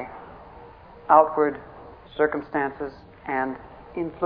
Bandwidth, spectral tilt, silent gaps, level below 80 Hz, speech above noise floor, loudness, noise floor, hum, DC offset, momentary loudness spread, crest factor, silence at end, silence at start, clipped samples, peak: 5.2 kHz; -9.5 dB/octave; none; -54 dBFS; 23 dB; -23 LUFS; -46 dBFS; none; under 0.1%; 26 LU; 24 dB; 0 s; 0 s; under 0.1%; -2 dBFS